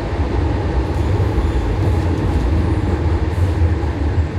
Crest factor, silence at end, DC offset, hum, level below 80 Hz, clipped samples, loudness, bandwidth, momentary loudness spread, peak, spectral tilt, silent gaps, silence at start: 10 dB; 0 s; under 0.1%; none; -20 dBFS; under 0.1%; -18 LUFS; 9.8 kHz; 2 LU; -6 dBFS; -8 dB/octave; none; 0 s